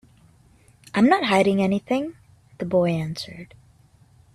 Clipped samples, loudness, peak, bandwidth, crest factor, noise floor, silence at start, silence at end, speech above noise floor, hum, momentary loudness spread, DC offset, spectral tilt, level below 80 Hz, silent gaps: under 0.1%; -22 LUFS; -4 dBFS; 13.5 kHz; 20 dB; -55 dBFS; 0.95 s; 0.9 s; 34 dB; none; 16 LU; under 0.1%; -6.5 dB/octave; -58 dBFS; none